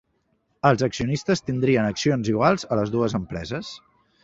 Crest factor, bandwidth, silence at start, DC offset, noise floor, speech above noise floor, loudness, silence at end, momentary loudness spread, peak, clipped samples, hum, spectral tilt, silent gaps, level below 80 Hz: 22 dB; 8 kHz; 0.65 s; under 0.1%; -69 dBFS; 47 dB; -23 LUFS; 0.45 s; 11 LU; -2 dBFS; under 0.1%; none; -6 dB/octave; none; -50 dBFS